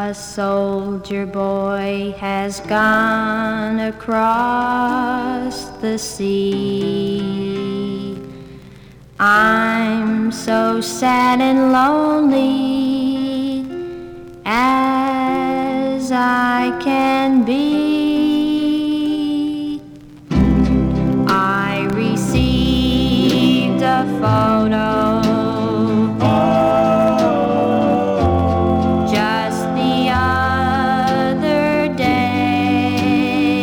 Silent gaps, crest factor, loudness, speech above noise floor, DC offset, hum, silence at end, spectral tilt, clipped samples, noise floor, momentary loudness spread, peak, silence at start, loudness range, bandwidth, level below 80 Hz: none; 14 dB; -16 LUFS; 24 dB; under 0.1%; none; 0 s; -6 dB/octave; under 0.1%; -41 dBFS; 8 LU; -2 dBFS; 0 s; 4 LU; over 20 kHz; -36 dBFS